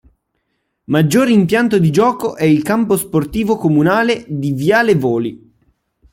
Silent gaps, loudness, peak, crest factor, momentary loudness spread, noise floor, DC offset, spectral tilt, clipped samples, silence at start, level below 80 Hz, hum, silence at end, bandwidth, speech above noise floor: none; -14 LUFS; -2 dBFS; 14 dB; 6 LU; -69 dBFS; under 0.1%; -6.5 dB/octave; under 0.1%; 0.9 s; -46 dBFS; none; 0.75 s; 16.5 kHz; 55 dB